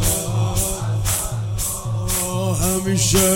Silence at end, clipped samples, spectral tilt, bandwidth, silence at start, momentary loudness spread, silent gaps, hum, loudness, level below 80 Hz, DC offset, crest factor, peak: 0 s; under 0.1%; -4 dB/octave; 17 kHz; 0 s; 6 LU; none; none; -20 LUFS; -32 dBFS; under 0.1%; 16 dB; -2 dBFS